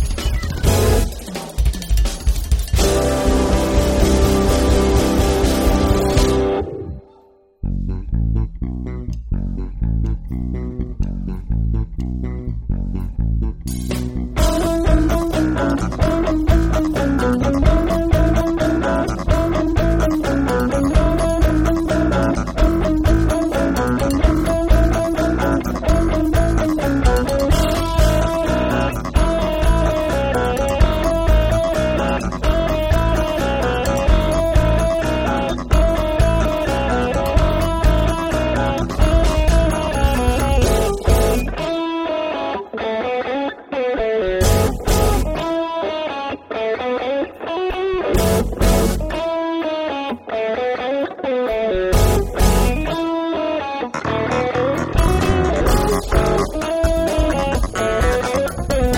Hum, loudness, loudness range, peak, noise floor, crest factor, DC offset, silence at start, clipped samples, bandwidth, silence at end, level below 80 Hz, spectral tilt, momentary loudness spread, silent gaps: none; -19 LUFS; 5 LU; -2 dBFS; -50 dBFS; 16 dB; under 0.1%; 0 s; under 0.1%; 17 kHz; 0 s; -22 dBFS; -6 dB/octave; 8 LU; none